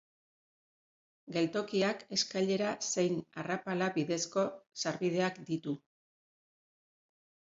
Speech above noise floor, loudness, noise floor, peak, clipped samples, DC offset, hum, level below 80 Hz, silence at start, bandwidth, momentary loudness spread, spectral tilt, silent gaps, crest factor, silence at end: over 56 dB; -34 LUFS; under -90 dBFS; -18 dBFS; under 0.1%; under 0.1%; none; -78 dBFS; 1.25 s; 7.8 kHz; 6 LU; -4 dB/octave; none; 18 dB; 1.8 s